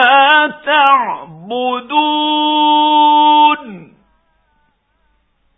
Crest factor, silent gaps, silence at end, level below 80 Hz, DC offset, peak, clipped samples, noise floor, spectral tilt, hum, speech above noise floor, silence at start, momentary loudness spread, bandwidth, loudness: 14 dB; none; 1.75 s; -64 dBFS; under 0.1%; 0 dBFS; under 0.1%; -60 dBFS; -5.5 dB/octave; none; 47 dB; 0 s; 12 LU; 3.9 kHz; -11 LUFS